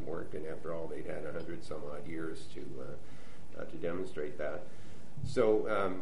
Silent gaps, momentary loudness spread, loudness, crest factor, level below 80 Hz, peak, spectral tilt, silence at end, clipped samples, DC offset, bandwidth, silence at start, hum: none; 20 LU; -38 LUFS; 20 dB; -60 dBFS; -16 dBFS; -6.5 dB/octave; 0 s; under 0.1%; 3%; 10.5 kHz; 0 s; none